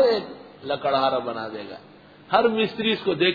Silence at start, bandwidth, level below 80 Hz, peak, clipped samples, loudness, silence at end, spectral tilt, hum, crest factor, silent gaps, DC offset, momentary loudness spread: 0 s; 5 kHz; -64 dBFS; -6 dBFS; under 0.1%; -23 LUFS; 0 s; -7 dB/octave; none; 18 dB; none; under 0.1%; 18 LU